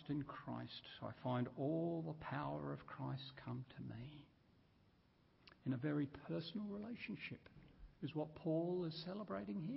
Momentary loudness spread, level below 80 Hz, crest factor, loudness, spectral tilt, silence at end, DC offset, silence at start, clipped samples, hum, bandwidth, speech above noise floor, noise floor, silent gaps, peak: 11 LU; -72 dBFS; 16 dB; -46 LUFS; -6 dB/octave; 0 s; under 0.1%; 0 s; under 0.1%; none; 5.6 kHz; 28 dB; -74 dBFS; none; -30 dBFS